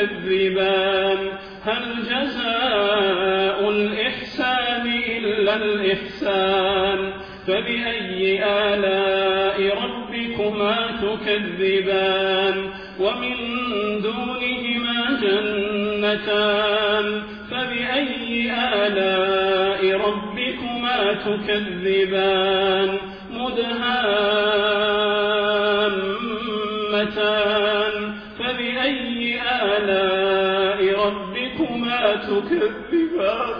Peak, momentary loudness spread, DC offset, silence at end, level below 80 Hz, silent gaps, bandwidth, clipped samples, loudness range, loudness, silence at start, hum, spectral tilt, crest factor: -6 dBFS; 6 LU; under 0.1%; 0 s; -50 dBFS; none; 5.4 kHz; under 0.1%; 2 LU; -21 LUFS; 0 s; none; -6.5 dB/octave; 14 dB